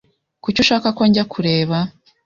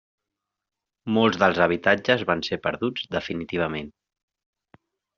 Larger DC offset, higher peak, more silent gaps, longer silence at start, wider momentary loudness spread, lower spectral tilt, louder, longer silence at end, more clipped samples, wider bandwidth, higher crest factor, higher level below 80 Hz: neither; about the same, -2 dBFS vs -4 dBFS; neither; second, 0.45 s vs 1.05 s; about the same, 9 LU vs 10 LU; first, -5.5 dB/octave vs -3 dB/octave; first, -17 LUFS vs -23 LUFS; second, 0.35 s vs 1.3 s; neither; about the same, 7.4 kHz vs 7.2 kHz; second, 16 dB vs 22 dB; first, -50 dBFS vs -60 dBFS